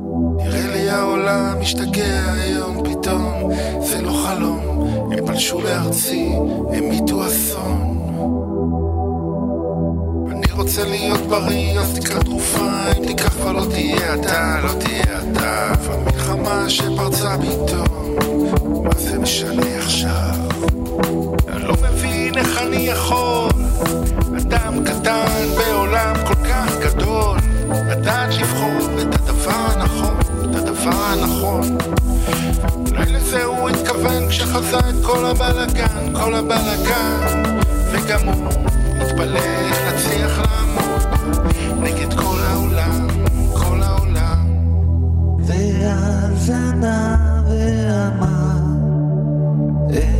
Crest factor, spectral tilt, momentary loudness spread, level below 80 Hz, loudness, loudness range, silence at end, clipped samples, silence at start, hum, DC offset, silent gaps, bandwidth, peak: 16 dB; -5 dB/octave; 3 LU; -22 dBFS; -18 LUFS; 2 LU; 0 s; under 0.1%; 0 s; none; under 0.1%; none; 16.5 kHz; 0 dBFS